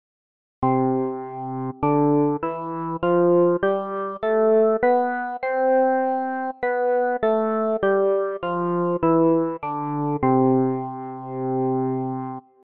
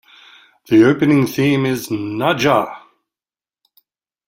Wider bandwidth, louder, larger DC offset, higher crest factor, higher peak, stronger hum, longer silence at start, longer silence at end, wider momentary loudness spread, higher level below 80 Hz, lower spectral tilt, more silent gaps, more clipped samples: second, 4.4 kHz vs 16.5 kHz; second, -22 LUFS vs -15 LUFS; first, 0.2% vs under 0.1%; about the same, 14 dB vs 16 dB; second, -8 dBFS vs -2 dBFS; neither; about the same, 0.6 s vs 0.7 s; second, 0.25 s vs 1.5 s; about the same, 10 LU vs 9 LU; about the same, -56 dBFS vs -56 dBFS; first, -11.5 dB/octave vs -6 dB/octave; neither; neither